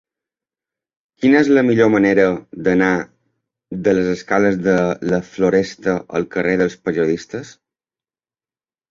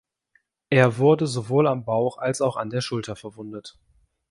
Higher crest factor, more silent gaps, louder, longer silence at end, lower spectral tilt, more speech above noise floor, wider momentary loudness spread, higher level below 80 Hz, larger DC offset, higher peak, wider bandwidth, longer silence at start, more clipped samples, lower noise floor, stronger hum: about the same, 16 dB vs 20 dB; neither; first, -17 LUFS vs -22 LUFS; first, 1.4 s vs 0.6 s; about the same, -6.5 dB/octave vs -6 dB/octave; first, over 74 dB vs 45 dB; second, 9 LU vs 18 LU; first, -52 dBFS vs -62 dBFS; neither; about the same, -2 dBFS vs -4 dBFS; second, 7.6 kHz vs 11.5 kHz; first, 1.2 s vs 0.7 s; neither; first, under -90 dBFS vs -67 dBFS; neither